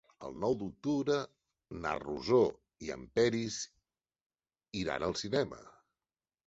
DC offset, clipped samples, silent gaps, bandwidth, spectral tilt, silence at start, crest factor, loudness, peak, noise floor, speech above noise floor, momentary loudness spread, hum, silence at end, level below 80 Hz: under 0.1%; under 0.1%; 4.22-4.30 s; 8.2 kHz; -5 dB/octave; 0.2 s; 20 dB; -34 LUFS; -16 dBFS; under -90 dBFS; over 56 dB; 16 LU; none; 0.75 s; -62 dBFS